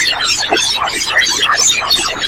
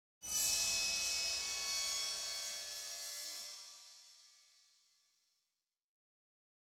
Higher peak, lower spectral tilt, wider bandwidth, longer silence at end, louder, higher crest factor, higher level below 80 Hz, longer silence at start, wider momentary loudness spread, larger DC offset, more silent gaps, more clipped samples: first, 0 dBFS vs -24 dBFS; first, 0.5 dB/octave vs 2.5 dB/octave; about the same, 17 kHz vs 18 kHz; second, 0 s vs 2.35 s; first, -11 LUFS vs -37 LUFS; second, 14 dB vs 20 dB; first, -42 dBFS vs -72 dBFS; second, 0 s vs 0.2 s; second, 3 LU vs 18 LU; first, 0.1% vs under 0.1%; neither; neither